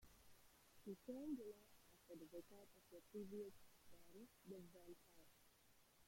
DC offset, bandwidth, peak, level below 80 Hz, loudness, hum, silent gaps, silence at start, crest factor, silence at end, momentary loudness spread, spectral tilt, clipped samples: under 0.1%; 16.5 kHz; -40 dBFS; -82 dBFS; -59 LUFS; none; none; 0 s; 18 dB; 0 s; 14 LU; -5.5 dB/octave; under 0.1%